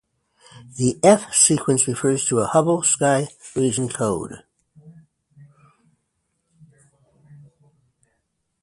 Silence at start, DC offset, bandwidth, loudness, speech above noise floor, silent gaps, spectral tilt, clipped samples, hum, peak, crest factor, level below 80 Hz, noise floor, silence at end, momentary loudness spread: 0.55 s; under 0.1%; 11.5 kHz; -19 LUFS; 54 dB; none; -4 dB/octave; under 0.1%; none; 0 dBFS; 22 dB; -58 dBFS; -73 dBFS; 3.7 s; 10 LU